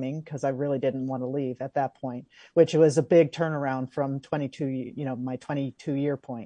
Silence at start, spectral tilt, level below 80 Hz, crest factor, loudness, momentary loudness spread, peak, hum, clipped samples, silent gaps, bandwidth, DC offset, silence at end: 0 s; -7 dB/octave; -72 dBFS; 20 dB; -27 LUFS; 12 LU; -6 dBFS; none; under 0.1%; none; 10 kHz; under 0.1%; 0 s